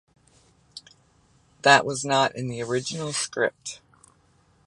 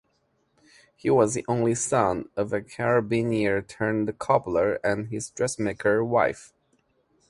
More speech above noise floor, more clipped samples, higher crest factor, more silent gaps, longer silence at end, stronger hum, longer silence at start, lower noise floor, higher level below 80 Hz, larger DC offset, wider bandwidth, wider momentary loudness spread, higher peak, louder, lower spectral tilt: second, 38 dB vs 46 dB; neither; about the same, 24 dB vs 20 dB; neither; about the same, 0.9 s vs 0.85 s; neither; second, 0.75 s vs 1.05 s; second, -62 dBFS vs -70 dBFS; second, -64 dBFS vs -56 dBFS; neither; about the same, 11.5 kHz vs 11.5 kHz; first, 26 LU vs 7 LU; first, -2 dBFS vs -6 dBFS; about the same, -23 LUFS vs -25 LUFS; second, -3 dB/octave vs -5.5 dB/octave